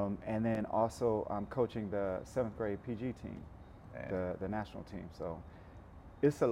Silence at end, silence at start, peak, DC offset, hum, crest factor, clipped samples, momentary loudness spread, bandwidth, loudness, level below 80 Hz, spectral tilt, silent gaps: 0 s; 0 s; -18 dBFS; under 0.1%; none; 20 dB; under 0.1%; 20 LU; 15.5 kHz; -37 LUFS; -58 dBFS; -7.5 dB/octave; none